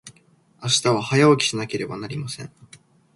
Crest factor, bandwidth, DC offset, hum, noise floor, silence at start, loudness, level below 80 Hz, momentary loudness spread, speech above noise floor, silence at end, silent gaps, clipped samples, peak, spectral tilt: 20 dB; 11.5 kHz; under 0.1%; none; -57 dBFS; 0.05 s; -21 LUFS; -60 dBFS; 16 LU; 35 dB; 0.4 s; none; under 0.1%; -4 dBFS; -4 dB/octave